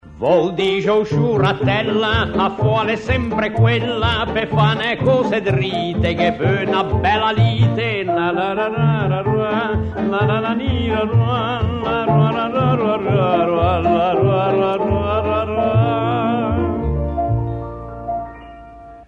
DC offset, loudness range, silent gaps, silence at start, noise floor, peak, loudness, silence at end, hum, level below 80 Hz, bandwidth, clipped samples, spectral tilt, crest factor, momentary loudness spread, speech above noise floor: under 0.1%; 2 LU; none; 0.05 s; -38 dBFS; -2 dBFS; -17 LUFS; 0.05 s; none; -34 dBFS; 7.8 kHz; under 0.1%; -8 dB/octave; 16 dB; 5 LU; 21 dB